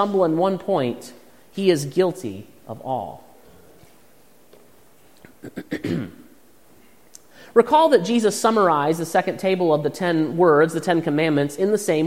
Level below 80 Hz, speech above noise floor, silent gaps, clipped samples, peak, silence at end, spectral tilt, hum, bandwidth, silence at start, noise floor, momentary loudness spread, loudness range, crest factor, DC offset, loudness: -64 dBFS; 35 dB; none; under 0.1%; -2 dBFS; 0 s; -5.5 dB/octave; none; 16 kHz; 0 s; -55 dBFS; 20 LU; 16 LU; 20 dB; 0.3%; -20 LUFS